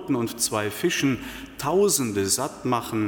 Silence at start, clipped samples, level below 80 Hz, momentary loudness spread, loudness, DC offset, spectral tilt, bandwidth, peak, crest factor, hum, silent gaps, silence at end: 0 s; under 0.1%; -54 dBFS; 8 LU; -24 LUFS; under 0.1%; -3.5 dB/octave; 17.5 kHz; -8 dBFS; 16 dB; none; none; 0 s